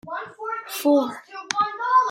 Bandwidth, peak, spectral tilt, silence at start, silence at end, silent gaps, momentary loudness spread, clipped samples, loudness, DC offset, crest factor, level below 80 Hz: 16.5 kHz; -4 dBFS; -3 dB/octave; 0.05 s; 0 s; none; 12 LU; under 0.1%; -23 LUFS; under 0.1%; 20 dB; -74 dBFS